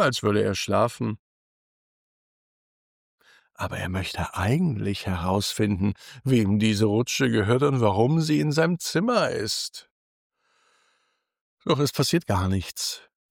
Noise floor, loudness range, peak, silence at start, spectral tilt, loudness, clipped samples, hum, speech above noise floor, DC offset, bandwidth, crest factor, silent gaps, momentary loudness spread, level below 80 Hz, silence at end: -72 dBFS; 9 LU; -8 dBFS; 0 s; -5.5 dB/octave; -24 LUFS; under 0.1%; none; 49 dB; under 0.1%; 18.5 kHz; 18 dB; 1.19-3.18 s, 9.91-10.30 s, 11.41-11.57 s; 10 LU; -56 dBFS; 0.3 s